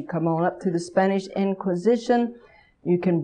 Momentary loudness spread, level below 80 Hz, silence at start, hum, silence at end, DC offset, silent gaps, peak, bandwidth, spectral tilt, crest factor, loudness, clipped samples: 5 LU; -64 dBFS; 0 s; none; 0 s; under 0.1%; none; -8 dBFS; 9.8 kHz; -7.5 dB/octave; 16 dB; -24 LUFS; under 0.1%